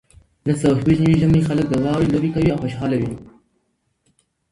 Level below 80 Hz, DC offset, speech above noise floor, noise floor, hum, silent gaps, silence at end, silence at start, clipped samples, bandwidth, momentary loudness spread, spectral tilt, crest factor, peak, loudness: -40 dBFS; under 0.1%; 51 dB; -69 dBFS; none; none; 1.3 s; 0.45 s; under 0.1%; 11.5 kHz; 8 LU; -8 dB/octave; 16 dB; -4 dBFS; -19 LUFS